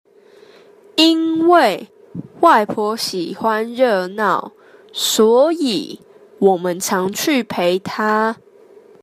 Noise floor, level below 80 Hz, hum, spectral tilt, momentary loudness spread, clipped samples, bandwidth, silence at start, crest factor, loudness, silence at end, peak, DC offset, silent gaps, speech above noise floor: -47 dBFS; -66 dBFS; none; -3.5 dB/octave; 13 LU; under 0.1%; 15.5 kHz; 0.95 s; 16 dB; -16 LUFS; 0.7 s; -2 dBFS; under 0.1%; none; 31 dB